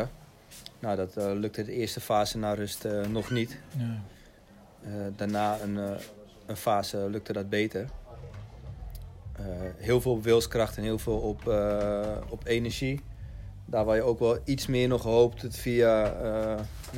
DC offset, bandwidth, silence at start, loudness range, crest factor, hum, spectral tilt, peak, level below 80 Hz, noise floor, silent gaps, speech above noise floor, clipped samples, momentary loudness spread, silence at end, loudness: under 0.1%; 16 kHz; 0 s; 7 LU; 20 dB; none; -6 dB/octave; -10 dBFS; -46 dBFS; -54 dBFS; none; 26 dB; under 0.1%; 20 LU; 0 s; -29 LUFS